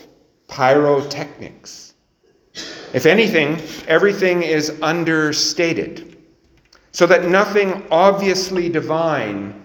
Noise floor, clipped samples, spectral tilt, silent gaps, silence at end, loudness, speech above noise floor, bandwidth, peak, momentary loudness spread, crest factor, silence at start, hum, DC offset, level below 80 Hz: -59 dBFS; under 0.1%; -4.5 dB/octave; none; 0.05 s; -16 LUFS; 42 dB; over 20 kHz; 0 dBFS; 18 LU; 18 dB; 0.5 s; none; under 0.1%; -58 dBFS